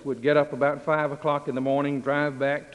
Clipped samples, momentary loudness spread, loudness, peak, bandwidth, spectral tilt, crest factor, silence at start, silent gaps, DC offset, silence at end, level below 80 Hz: under 0.1%; 4 LU; -25 LUFS; -8 dBFS; 11 kHz; -7.5 dB/octave; 18 dB; 0 s; none; under 0.1%; 0 s; -66 dBFS